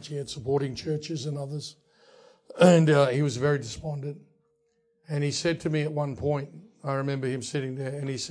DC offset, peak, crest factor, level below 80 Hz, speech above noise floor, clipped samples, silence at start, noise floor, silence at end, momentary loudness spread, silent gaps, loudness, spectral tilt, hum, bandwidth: under 0.1%; -6 dBFS; 22 dB; -60 dBFS; 44 dB; under 0.1%; 0 s; -71 dBFS; 0 s; 16 LU; none; -27 LUFS; -6 dB/octave; none; 10.5 kHz